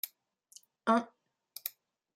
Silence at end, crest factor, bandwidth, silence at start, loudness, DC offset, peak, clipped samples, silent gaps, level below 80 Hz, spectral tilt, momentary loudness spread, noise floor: 0.45 s; 22 dB; 16 kHz; 0.05 s; -34 LUFS; under 0.1%; -16 dBFS; under 0.1%; none; -88 dBFS; -4 dB/octave; 19 LU; -65 dBFS